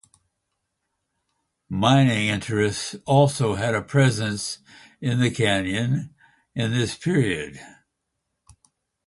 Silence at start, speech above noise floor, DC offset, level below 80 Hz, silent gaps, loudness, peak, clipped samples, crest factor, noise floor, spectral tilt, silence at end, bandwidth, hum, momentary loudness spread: 1.7 s; 57 dB; under 0.1%; -52 dBFS; none; -22 LUFS; -4 dBFS; under 0.1%; 20 dB; -79 dBFS; -5.5 dB/octave; 1.4 s; 11.5 kHz; none; 12 LU